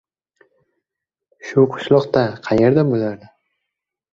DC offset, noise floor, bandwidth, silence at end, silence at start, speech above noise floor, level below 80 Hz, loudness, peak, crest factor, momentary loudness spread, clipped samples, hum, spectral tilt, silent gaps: under 0.1%; -84 dBFS; 7.4 kHz; 1 s; 1.45 s; 68 dB; -54 dBFS; -17 LUFS; -2 dBFS; 18 dB; 11 LU; under 0.1%; none; -8 dB/octave; none